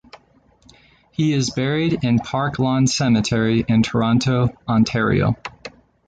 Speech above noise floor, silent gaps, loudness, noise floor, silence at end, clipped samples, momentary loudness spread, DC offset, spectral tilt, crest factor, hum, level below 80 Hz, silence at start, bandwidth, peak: 37 dB; none; -19 LUFS; -55 dBFS; 0.4 s; under 0.1%; 7 LU; under 0.1%; -6 dB/octave; 14 dB; none; -44 dBFS; 1.2 s; 9.2 kHz; -6 dBFS